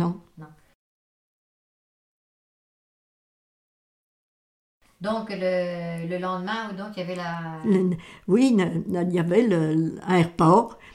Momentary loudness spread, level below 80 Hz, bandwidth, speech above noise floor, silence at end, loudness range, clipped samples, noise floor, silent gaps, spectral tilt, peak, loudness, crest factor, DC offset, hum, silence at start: 12 LU; -60 dBFS; 11.5 kHz; 24 dB; 0.05 s; 12 LU; under 0.1%; -47 dBFS; 0.75-4.81 s; -7.5 dB/octave; -4 dBFS; -24 LUFS; 20 dB; under 0.1%; none; 0 s